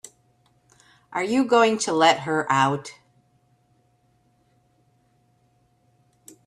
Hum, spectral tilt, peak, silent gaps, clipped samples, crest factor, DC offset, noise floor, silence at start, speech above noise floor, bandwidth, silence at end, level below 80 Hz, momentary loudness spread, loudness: none; -4 dB/octave; -4 dBFS; none; under 0.1%; 22 dB; under 0.1%; -64 dBFS; 1.1 s; 44 dB; 13 kHz; 3.55 s; -70 dBFS; 13 LU; -21 LUFS